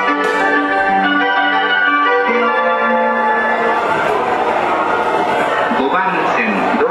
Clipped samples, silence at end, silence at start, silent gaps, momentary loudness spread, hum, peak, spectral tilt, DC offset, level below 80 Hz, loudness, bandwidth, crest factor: under 0.1%; 0 s; 0 s; none; 3 LU; none; -4 dBFS; -4.5 dB/octave; under 0.1%; -52 dBFS; -14 LUFS; 13.5 kHz; 10 dB